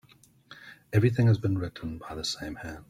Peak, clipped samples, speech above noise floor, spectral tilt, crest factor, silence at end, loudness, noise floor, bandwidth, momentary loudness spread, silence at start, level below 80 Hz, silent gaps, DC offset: -10 dBFS; under 0.1%; 29 dB; -6.5 dB/octave; 18 dB; 0.1 s; -28 LUFS; -56 dBFS; 14 kHz; 24 LU; 0.5 s; -54 dBFS; none; under 0.1%